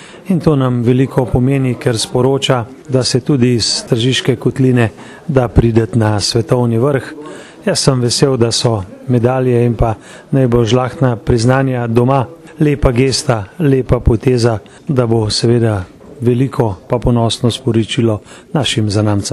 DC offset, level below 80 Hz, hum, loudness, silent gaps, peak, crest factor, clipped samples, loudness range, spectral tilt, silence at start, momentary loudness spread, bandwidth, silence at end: under 0.1%; -30 dBFS; none; -14 LUFS; none; 0 dBFS; 14 dB; under 0.1%; 1 LU; -6 dB/octave; 0 s; 6 LU; 12.5 kHz; 0 s